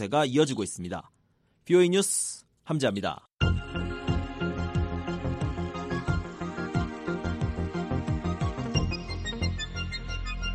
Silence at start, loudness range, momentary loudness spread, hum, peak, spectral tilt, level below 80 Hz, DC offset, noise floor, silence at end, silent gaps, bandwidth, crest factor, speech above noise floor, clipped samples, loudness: 0 s; 4 LU; 10 LU; none; -10 dBFS; -5 dB/octave; -40 dBFS; under 0.1%; -68 dBFS; 0 s; none; 13 kHz; 18 dB; 42 dB; under 0.1%; -29 LUFS